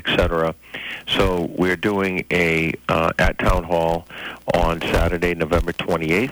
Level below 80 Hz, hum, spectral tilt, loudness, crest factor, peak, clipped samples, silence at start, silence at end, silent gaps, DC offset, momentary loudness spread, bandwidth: -30 dBFS; none; -5.5 dB/octave; -20 LUFS; 14 dB; -6 dBFS; under 0.1%; 0 s; 0 s; none; under 0.1%; 7 LU; over 20 kHz